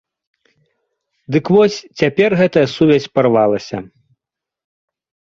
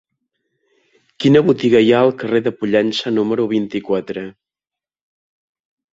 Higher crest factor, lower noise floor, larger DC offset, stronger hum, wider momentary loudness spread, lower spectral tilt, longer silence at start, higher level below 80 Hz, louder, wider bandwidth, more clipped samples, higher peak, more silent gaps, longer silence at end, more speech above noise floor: about the same, 16 dB vs 16 dB; second, -85 dBFS vs -89 dBFS; neither; neither; about the same, 8 LU vs 9 LU; about the same, -6.5 dB/octave vs -6.5 dB/octave; about the same, 1.3 s vs 1.2 s; about the same, -54 dBFS vs -58 dBFS; about the same, -14 LUFS vs -16 LUFS; about the same, 7.4 kHz vs 7.8 kHz; neither; about the same, -2 dBFS vs -2 dBFS; neither; second, 1.45 s vs 1.65 s; about the same, 71 dB vs 74 dB